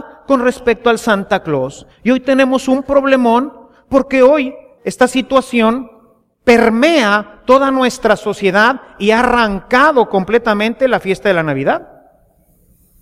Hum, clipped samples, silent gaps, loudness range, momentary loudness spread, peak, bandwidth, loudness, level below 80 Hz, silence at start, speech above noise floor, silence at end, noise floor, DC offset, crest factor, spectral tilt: none; under 0.1%; none; 2 LU; 7 LU; 0 dBFS; 15 kHz; -13 LUFS; -42 dBFS; 0 s; 40 dB; 1.2 s; -52 dBFS; under 0.1%; 14 dB; -5 dB/octave